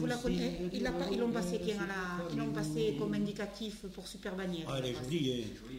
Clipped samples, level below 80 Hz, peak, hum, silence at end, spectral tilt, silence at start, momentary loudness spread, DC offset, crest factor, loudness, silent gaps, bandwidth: under 0.1%; -54 dBFS; -22 dBFS; none; 0 s; -5.5 dB/octave; 0 s; 8 LU; under 0.1%; 14 dB; -36 LUFS; none; 16 kHz